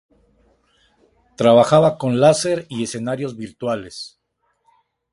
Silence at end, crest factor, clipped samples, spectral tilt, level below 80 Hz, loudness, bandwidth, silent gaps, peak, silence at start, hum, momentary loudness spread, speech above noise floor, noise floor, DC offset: 1.05 s; 20 dB; under 0.1%; -5.5 dB/octave; -56 dBFS; -18 LUFS; 11.5 kHz; none; 0 dBFS; 1.4 s; none; 16 LU; 52 dB; -69 dBFS; under 0.1%